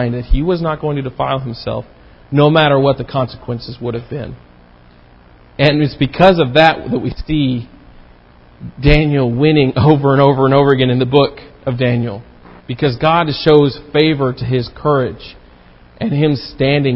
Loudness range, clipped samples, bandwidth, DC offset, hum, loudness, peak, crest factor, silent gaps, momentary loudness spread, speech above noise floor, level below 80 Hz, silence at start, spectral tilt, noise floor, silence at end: 4 LU; under 0.1%; 5.8 kHz; under 0.1%; none; -14 LUFS; 0 dBFS; 14 dB; none; 14 LU; 30 dB; -30 dBFS; 0 s; -9 dB/octave; -44 dBFS; 0 s